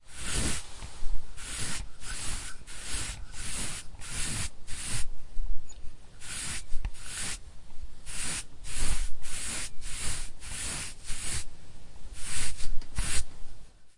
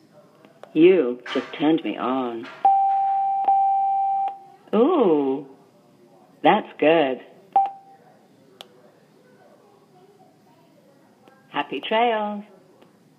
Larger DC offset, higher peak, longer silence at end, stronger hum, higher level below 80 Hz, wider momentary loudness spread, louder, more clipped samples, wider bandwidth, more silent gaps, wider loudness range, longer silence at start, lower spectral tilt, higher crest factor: neither; second, -10 dBFS vs -4 dBFS; second, 0.1 s vs 0.75 s; neither; first, -36 dBFS vs -82 dBFS; about the same, 14 LU vs 12 LU; second, -36 LUFS vs -21 LUFS; neither; first, 11.5 kHz vs 6.4 kHz; neither; second, 2 LU vs 11 LU; second, 0 s vs 0.75 s; second, -2 dB/octave vs -7 dB/octave; second, 14 dB vs 20 dB